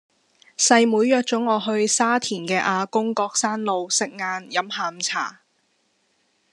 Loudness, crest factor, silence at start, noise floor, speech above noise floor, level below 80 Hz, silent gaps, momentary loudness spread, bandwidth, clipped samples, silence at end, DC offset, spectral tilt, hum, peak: -21 LUFS; 22 dB; 0.6 s; -67 dBFS; 46 dB; -82 dBFS; none; 9 LU; 12 kHz; under 0.1%; 1.2 s; under 0.1%; -2.5 dB/octave; none; -2 dBFS